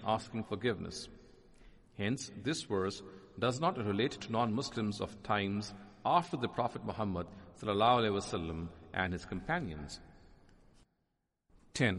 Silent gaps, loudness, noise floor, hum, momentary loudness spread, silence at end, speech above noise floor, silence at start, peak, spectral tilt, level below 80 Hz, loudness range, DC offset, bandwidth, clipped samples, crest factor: none; -36 LUFS; -83 dBFS; none; 14 LU; 0 s; 47 dB; 0 s; -14 dBFS; -5 dB/octave; -60 dBFS; 5 LU; under 0.1%; 11.5 kHz; under 0.1%; 22 dB